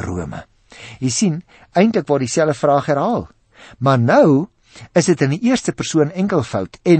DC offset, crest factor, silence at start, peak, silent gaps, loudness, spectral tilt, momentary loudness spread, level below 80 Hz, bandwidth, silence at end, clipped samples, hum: under 0.1%; 16 dB; 0 s; -2 dBFS; none; -17 LUFS; -6 dB/octave; 12 LU; -50 dBFS; 8.8 kHz; 0 s; under 0.1%; none